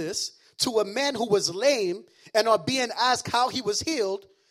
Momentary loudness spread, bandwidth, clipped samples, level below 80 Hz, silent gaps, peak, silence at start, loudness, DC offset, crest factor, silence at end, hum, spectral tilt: 8 LU; 16 kHz; under 0.1%; -66 dBFS; none; -6 dBFS; 0 s; -25 LUFS; under 0.1%; 20 dB; 0.3 s; none; -2.5 dB/octave